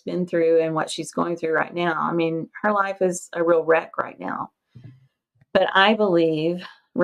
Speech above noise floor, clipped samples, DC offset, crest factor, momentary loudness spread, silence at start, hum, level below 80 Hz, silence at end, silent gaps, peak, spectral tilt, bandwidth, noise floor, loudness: 41 dB; under 0.1%; under 0.1%; 20 dB; 13 LU; 0.05 s; none; -70 dBFS; 0 s; none; -2 dBFS; -5 dB/octave; 12.5 kHz; -62 dBFS; -22 LUFS